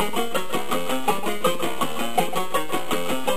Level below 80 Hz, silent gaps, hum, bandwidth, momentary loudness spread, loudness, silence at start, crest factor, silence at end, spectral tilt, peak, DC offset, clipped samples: -56 dBFS; none; none; 15.5 kHz; 2 LU; -25 LUFS; 0 s; 18 dB; 0 s; -3.5 dB/octave; -6 dBFS; 7%; under 0.1%